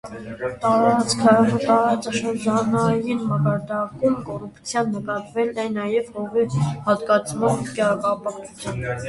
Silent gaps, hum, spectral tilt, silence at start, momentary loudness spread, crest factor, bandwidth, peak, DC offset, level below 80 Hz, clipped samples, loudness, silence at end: none; none; -6 dB/octave; 0.05 s; 10 LU; 20 dB; 11.5 kHz; -2 dBFS; under 0.1%; -52 dBFS; under 0.1%; -21 LUFS; 0 s